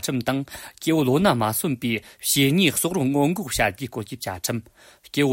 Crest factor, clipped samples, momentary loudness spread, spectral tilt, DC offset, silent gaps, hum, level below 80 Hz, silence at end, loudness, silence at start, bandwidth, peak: 16 dB; under 0.1%; 12 LU; -4.5 dB/octave; under 0.1%; none; none; -50 dBFS; 0 s; -23 LUFS; 0 s; 16.5 kHz; -6 dBFS